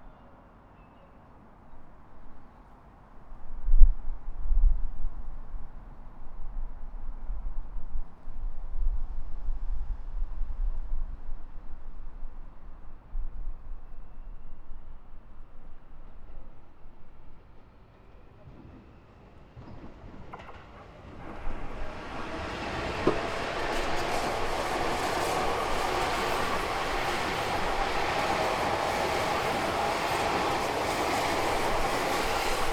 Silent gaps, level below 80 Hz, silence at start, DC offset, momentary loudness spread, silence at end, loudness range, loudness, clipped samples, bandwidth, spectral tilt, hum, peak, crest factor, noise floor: none; -32 dBFS; 0 s; under 0.1%; 23 LU; 0 s; 21 LU; -31 LUFS; under 0.1%; 15 kHz; -4 dB/octave; none; 0 dBFS; 28 dB; -53 dBFS